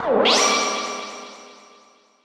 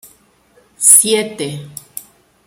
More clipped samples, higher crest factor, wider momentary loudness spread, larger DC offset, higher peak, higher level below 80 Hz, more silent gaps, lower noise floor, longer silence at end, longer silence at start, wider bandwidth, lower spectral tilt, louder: second, under 0.1% vs 0.3%; about the same, 18 dB vs 18 dB; second, 21 LU vs 24 LU; neither; second, -6 dBFS vs 0 dBFS; about the same, -62 dBFS vs -64 dBFS; neither; about the same, -54 dBFS vs -53 dBFS; first, 0.7 s vs 0.45 s; second, 0 s vs 0.8 s; second, 15 kHz vs over 20 kHz; about the same, -1 dB/octave vs -1.5 dB/octave; second, -19 LUFS vs -9 LUFS